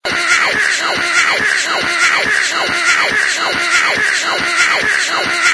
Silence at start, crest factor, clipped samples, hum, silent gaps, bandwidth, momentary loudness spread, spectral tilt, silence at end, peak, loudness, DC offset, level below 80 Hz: 0.05 s; 14 dB; under 0.1%; none; none; 11 kHz; 3 LU; 0 dB/octave; 0 s; 0 dBFS; -12 LUFS; under 0.1%; -52 dBFS